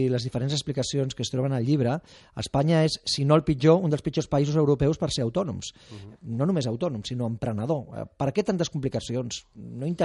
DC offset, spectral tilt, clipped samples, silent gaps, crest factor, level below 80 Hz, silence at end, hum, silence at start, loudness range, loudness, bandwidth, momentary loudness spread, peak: under 0.1%; -6 dB/octave; under 0.1%; none; 20 dB; -50 dBFS; 0 s; none; 0 s; 6 LU; -26 LUFS; 11.5 kHz; 14 LU; -6 dBFS